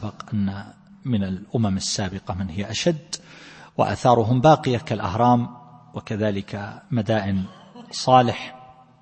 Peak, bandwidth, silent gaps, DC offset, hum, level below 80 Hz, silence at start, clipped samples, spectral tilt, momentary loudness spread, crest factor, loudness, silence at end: -2 dBFS; 8.8 kHz; none; under 0.1%; none; -54 dBFS; 0 s; under 0.1%; -6 dB/octave; 17 LU; 20 dB; -22 LUFS; 0.3 s